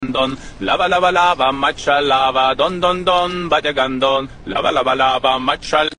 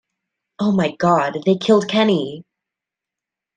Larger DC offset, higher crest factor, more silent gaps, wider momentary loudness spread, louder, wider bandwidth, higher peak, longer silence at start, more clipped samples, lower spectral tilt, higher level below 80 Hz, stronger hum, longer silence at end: neither; about the same, 16 dB vs 16 dB; neither; about the same, 6 LU vs 8 LU; about the same, -16 LUFS vs -17 LUFS; about the same, 10 kHz vs 9.4 kHz; first, 0 dBFS vs -4 dBFS; second, 0 s vs 0.6 s; neither; second, -4 dB/octave vs -6.5 dB/octave; first, -40 dBFS vs -62 dBFS; neither; second, 0.05 s vs 1.15 s